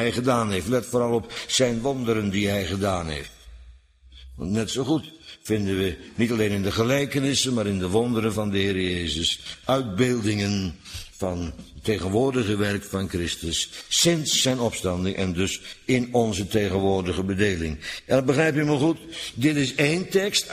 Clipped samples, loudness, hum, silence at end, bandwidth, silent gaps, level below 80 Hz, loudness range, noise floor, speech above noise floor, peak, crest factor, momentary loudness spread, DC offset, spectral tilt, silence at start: under 0.1%; -24 LUFS; none; 0 s; 15.5 kHz; none; -46 dBFS; 4 LU; -50 dBFS; 26 dB; -6 dBFS; 18 dB; 8 LU; under 0.1%; -4.5 dB/octave; 0 s